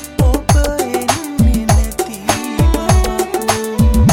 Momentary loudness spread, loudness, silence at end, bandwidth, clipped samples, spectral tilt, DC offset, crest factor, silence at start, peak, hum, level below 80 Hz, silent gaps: 5 LU; -15 LUFS; 0 s; 19 kHz; under 0.1%; -5.5 dB/octave; 0.2%; 12 dB; 0 s; 0 dBFS; none; -18 dBFS; none